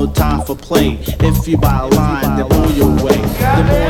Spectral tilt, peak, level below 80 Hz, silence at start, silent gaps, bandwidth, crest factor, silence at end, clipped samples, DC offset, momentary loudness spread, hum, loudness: -6.5 dB/octave; 0 dBFS; -20 dBFS; 0 s; none; over 20 kHz; 12 dB; 0 s; under 0.1%; under 0.1%; 4 LU; none; -14 LUFS